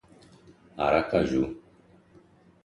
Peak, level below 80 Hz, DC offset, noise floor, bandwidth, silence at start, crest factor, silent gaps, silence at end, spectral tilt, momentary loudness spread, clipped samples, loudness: -8 dBFS; -52 dBFS; under 0.1%; -58 dBFS; 11 kHz; 0.75 s; 22 dB; none; 1.05 s; -7 dB/octave; 21 LU; under 0.1%; -26 LUFS